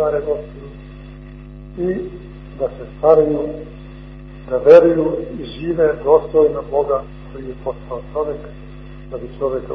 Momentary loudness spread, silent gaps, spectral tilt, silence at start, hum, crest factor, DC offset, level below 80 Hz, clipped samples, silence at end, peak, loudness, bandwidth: 24 LU; none; -9 dB/octave; 0 s; 50 Hz at -35 dBFS; 18 dB; under 0.1%; -38 dBFS; under 0.1%; 0 s; 0 dBFS; -17 LUFS; 5.4 kHz